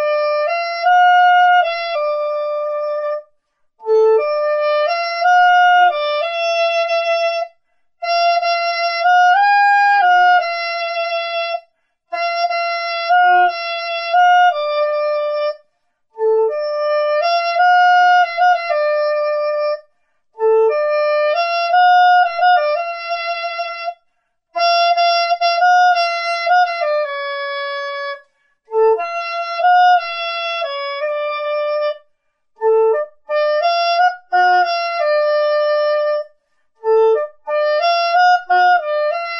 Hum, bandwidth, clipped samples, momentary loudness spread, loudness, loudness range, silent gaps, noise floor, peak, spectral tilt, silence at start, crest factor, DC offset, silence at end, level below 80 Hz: none; 6.6 kHz; under 0.1%; 11 LU; -15 LUFS; 4 LU; none; -66 dBFS; -4 dBFS; 1 dB/octave; 0 s; 12 dB; under 0.1%; 0 s; -74 dBFS